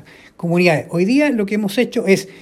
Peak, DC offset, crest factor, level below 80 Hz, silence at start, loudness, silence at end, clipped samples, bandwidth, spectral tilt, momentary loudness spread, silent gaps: 0 dBFS; under 0.1%; 16 dB; -60 dBFS; 0.4 s; -17 LUFS; 0 s; under 0.1%; 15.5 kHz; -6 dB/octave; 4 LU; none